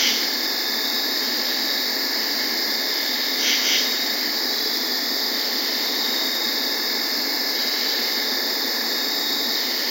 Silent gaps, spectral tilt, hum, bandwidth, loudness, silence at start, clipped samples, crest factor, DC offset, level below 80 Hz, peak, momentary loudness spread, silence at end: none; 1 dB/octave; none; 16.5 kHz; -20 LUFS; 0 s; under 0.1%; 16 dB; under 0.1%; under -90 dBFS; -6 dBFS; 2 LU; 0 s